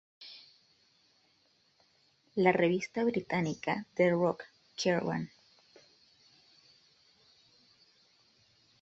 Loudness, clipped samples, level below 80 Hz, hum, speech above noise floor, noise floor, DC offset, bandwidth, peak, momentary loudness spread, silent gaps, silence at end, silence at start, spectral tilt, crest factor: -31 LUFS; under 0.1%; -74 dBFS; none; 40 dB; -71 dBFS; under 0.1%; 8 kHz; -12 dBFS; 20 LU; none; 3.55 s; 0.2 s; -6 dB/octave; 24 dB